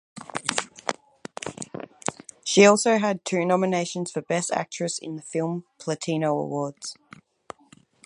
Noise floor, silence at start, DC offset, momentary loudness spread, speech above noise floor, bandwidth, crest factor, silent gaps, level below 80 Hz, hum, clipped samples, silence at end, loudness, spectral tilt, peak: -56 dBFS; 0.15 s; under 0.1%; 18 LU; 33 dB; 11.5 kHz; 24 dB; none; -72 dBFS; none; under 0.1%; 1.1 s; -25 LUFS; -4 dB/octave; -2 dBFS